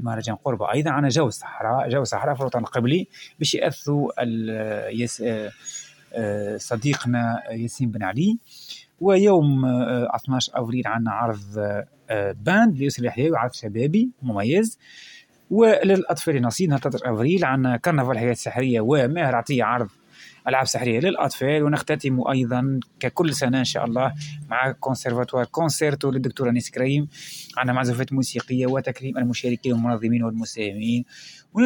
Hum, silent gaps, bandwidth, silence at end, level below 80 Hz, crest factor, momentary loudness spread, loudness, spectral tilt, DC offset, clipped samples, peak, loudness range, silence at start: none; none; 17 kHz; 0 s; -62 dBFS; 18 dB; 8 LU; -23 LUFS; -5.5 dB/octave; under 0.1%; under 0.1%; -4 dBFS; 4 LU; 0 s